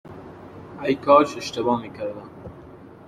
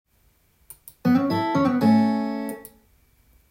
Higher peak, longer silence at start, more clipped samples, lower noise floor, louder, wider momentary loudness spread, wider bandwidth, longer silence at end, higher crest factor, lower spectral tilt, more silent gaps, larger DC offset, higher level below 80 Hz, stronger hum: first, -2 dBFS vs -8 dBFS; second, 0.05 s vs 1.05 s; neither; second, -44 dBFS vs -62 dBFS; about the same, -22 LUFS vs -22 LUFS; first, 25 LU vs 13 LU; second, 13.5 kHz vs 16.5 kHz; second, 0.15 s vs 0.85 s; first, 22 dB vs 16 dB; second, -5.5 dB/octave vs -7 dB/octave; neither; neither; about the same, -58 dBFS vs -62 dBFS; neither